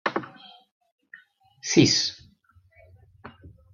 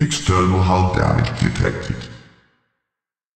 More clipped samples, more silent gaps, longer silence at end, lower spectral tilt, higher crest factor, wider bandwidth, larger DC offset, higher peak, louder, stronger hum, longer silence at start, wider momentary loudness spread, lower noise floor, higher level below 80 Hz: neither; first, 0.71-0.81 s, 0.92-0.98 s vs none; second, 0.25 s vs 1.2 s; second, -3.5 dB/octave vs -5.5 dB/octave; first, 24 dB vs 16 dB; second, 7.4 kHz vs 9.2 kHz; neither; about the same, -4 dBFS vs -2 dBFS; second, -22 LUFS vs -18 LUFS; neither; about the same, 0.05 s vs 0 s; first, 28 LU vs 12 LU; second, -60 dBFS vs -85 dBFS; second, -60 dBFS vs -36 dBFS